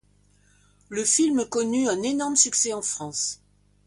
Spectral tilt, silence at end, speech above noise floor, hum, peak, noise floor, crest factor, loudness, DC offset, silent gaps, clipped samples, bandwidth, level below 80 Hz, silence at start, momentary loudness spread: -2 dB/octave; 0.5 s; 37 dB; 50 Hz at -55 dBFS; -6 dBFS; -61 dBFS; 20 dB; -23 LUFS; under 0.1%; none; under 0.1%; 11.5 kHz; -64 dBFS; 0.9 s; 9 LU